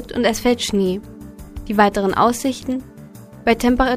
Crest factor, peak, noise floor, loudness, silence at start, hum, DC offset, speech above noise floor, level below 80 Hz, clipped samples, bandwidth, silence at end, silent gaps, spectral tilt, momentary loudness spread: 18 dB; 0 dBFS; -39 dBFS; -19 LUFS; 0 s; none; under 0.1%; 22 dB; -36 dBFS; under 0.1%; 15.5 kHz; 0 s; none; -4.5 dB/octave; 20 LU